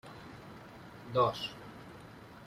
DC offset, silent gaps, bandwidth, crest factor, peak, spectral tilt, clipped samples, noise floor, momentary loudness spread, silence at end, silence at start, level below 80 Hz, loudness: under 0.1%; none; 15.5 kHz; 22 dB; -16 dBFS; -5.5 dB/octave; under 0.1%; -52 dBFS; 20 LU; 0 s; 0.05 s; -66 dBFS; -33 LUFS